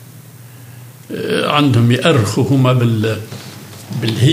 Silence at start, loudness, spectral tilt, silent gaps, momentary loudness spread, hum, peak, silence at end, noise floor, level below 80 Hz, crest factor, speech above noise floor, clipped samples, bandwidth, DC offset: 0 s; -14 LUFS; -6 dB/octave; none; 19 LU; none; 0 dBFS; 0 s; -37 dBFS; -60 dBFS; 16 dB; 24 dB; under 0.1%; 16 kHz; under 0.1%